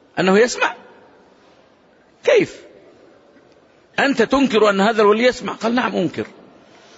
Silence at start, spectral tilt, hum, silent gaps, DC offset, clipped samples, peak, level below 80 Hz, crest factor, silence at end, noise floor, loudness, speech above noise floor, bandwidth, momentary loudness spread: 0.15 s; -4.5 dB/octave; none; none; under 0.1%; under 0.1%; -2 dBFS; -56 dBFS; 16 dB; 0.7 s; -53 dBFS; -17 LUFS; 37 dB; 8 kHz; 11 LU